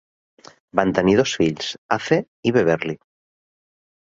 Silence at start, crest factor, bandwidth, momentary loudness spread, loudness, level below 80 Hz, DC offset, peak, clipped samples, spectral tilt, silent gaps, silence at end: 0.75 s; 20 dB; 7.8 kHz; 10 LU; -20 LUFS; -54 dBFS; under 0.1%; 0 dBFS; under 0.1%; -5.5 dB/octave; 1.78-1.89 s, 2.28-2.43 s; 1.1 s